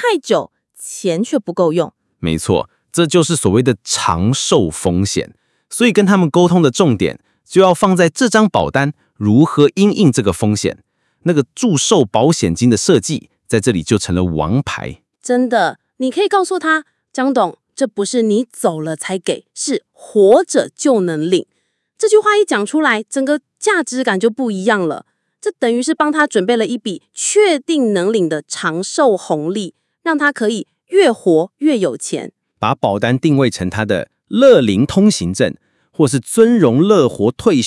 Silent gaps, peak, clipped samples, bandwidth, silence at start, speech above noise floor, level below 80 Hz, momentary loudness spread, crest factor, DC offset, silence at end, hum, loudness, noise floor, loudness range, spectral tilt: none; 0 dBFS; under 0.1%; 12 kHz; 0 s; 33 dB; -50 dBFS; 10 LU; 14 dB; under 0.1%; 0 s; none; -15 LUFS; -47 dBFS; 4 LU; -5 dB/octave